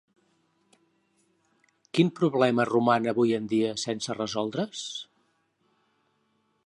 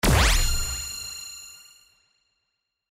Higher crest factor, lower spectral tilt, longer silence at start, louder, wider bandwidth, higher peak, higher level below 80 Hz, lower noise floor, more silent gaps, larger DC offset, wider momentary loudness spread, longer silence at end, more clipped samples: about the same, 20 dB vs 16 dB; first, -5.5 dB/octave vs -3 dB/octave; first, 1.95 s vs 0.05 s; about the same, -26 LUFS vs -25 LUFS; second, 11 kHz vs 16 kHz; about the same, -8 dBFS vs -10 dBFS; second, -72 dBFS vs -30 dBFS; second, -72 dBFS vs -79 dBFS; neither; neither; second, 11 LU vs 22 LU; first, 1.6 s vs 1.35 s; neither